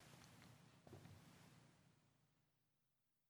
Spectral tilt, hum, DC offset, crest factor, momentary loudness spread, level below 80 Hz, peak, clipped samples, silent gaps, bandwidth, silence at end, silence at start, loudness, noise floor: -4.5 dB/octave; none; under 0.1%; 20 dB; 4 LU; under -90 dBFS; -48 dBFS; under 0.1%; none; over 20 kHz; 0 s; 0 s; -66 LUFS; -88 dBFS